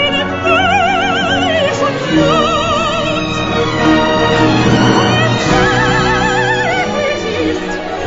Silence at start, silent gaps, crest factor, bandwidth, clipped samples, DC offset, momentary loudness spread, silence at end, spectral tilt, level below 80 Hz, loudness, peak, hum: 0 s; none; 12 dB; 7.8 kHz; under 0.1%; under 0.1%; 5 LU; 0 s; -5 dB/octave; -32 dBFS; -12 LUFS; 0 dBFS; none